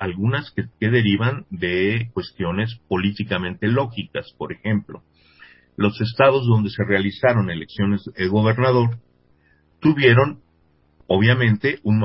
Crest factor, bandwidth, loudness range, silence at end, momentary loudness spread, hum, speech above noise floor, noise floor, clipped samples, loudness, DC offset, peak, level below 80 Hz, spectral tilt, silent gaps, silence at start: 18 dB; 5.8 kHz; 5 LU; 0 s; 10 LU; none; 41 dB; -60 dBFS; under 0.1%; -20 LUFS; under 0.1%; -2 dBFS; -46 dBFS; -11.5 dB/octave; none; 0 s